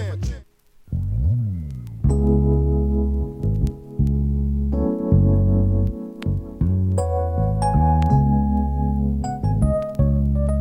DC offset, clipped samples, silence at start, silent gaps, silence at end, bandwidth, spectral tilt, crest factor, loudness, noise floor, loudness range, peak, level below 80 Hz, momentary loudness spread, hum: under 0.1%; under 0.1%; 0 s; none; 0 s; 11 kHz; -9.5 dB/octave; 14 dB; -21 LUFS; -49 dBFS; 2 LU; -4 dBFS; -24 dBFS; 9 LU; none